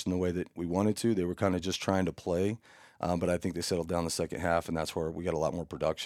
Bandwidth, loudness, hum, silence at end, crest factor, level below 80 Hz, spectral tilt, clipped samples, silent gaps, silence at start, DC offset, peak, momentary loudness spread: 16 kHz; -32 LUFS; none; 0 s; 20 dB; -58 dBFS; -5.5 dB/octave; under 0.1%; none; 0 s; under 0.1%; -12 dBFS; 4 LU